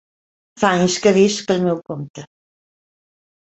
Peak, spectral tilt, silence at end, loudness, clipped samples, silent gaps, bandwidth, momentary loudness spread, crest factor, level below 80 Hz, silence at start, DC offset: -2 dBFS; -5 dB/octave; 1.25 s; -17 LUFS; under 0.1%; 2.10-2.14 s; 8.2 kHz; 16 LU; 18 dB; -58 dBFS; 0.55 s; under 0.1%